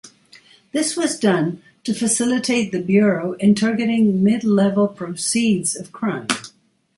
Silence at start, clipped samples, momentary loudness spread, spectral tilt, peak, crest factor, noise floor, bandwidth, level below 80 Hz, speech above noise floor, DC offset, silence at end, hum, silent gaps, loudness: 0.05 s; under 0.1%; 8 LU; -4.5 dB/octave; -2 dBFS; 16 dB; -55 dBFS; 11.5 kHz; -62 dBFS; 36 dB; under 0.1%; 0.5 s; none; none; -19 LUFS